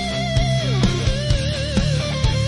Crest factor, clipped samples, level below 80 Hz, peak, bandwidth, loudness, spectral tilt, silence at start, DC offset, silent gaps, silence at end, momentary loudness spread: 12 dB; under 0.1%; -26 dBFS; -8 dBFS; 11.5 kHz; -20 LUFS; -5.5 dB/octave; 0 s; under 0.1%; none; 0 s; 2 LU